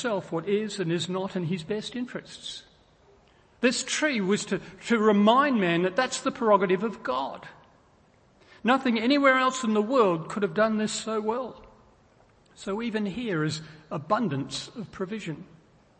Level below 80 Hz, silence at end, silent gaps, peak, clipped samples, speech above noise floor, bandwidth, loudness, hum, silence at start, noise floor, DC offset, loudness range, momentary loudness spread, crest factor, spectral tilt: -64 dBFS; 0.55 s; none; -8 dBFS; under 0.1%; 34 dB; 8.8 kHz; -26 LUFS; none; 0 s; -60 dBFS; under 0.1%; 7 LU; 16 LU; 20 dB; -4.5 dB/octave